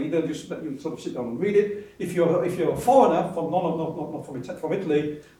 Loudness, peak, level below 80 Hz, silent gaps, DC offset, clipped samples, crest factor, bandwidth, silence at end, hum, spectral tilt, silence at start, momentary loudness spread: -25 LUFS; -4 dBFS; -60 dBFS; none; under 0.1%; under 0.1%; 20 dB; 15.5 kHz; 0.2 s; none; -7 dB/octave; 0 s; 14 LU